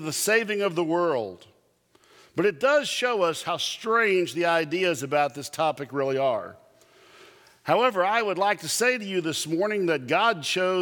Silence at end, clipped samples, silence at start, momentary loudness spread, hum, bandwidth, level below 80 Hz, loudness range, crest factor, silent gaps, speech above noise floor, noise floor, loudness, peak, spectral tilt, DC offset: 0 s; under 0.1%; 0 s; 6 LU; none; 19.5 kHz; -76 dBFS; 3 LU; 18 dB; none; 38 dB; -63 dBFS; -24 LUFS; -6 dBFS; -3.5 dB/octave; under 0.1%